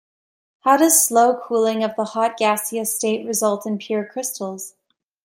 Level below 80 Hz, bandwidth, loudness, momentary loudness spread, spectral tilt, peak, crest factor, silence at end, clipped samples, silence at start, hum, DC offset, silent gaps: -72 dBFS; 16.5 kHz; -19 LUFS; 13 LU; -2.5 dB/octave; -2 dBFS; 18 dB; 0.55 s; under 0.1%; 0.65 s; none; under 0.1%; none